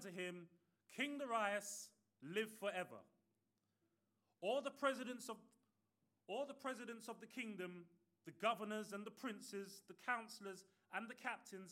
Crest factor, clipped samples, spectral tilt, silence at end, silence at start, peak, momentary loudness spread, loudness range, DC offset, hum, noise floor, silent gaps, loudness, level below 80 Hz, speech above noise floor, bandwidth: 24 dB; under 0.1%; -3.5 dB/octave; 0 s; 0 s; -26 dBFS; 15 LU; 3 LU; under 0.1%; none; -88 dBFS; none; -47 LUFS; under -90 dBFS; 41 dB; 16.5 kHz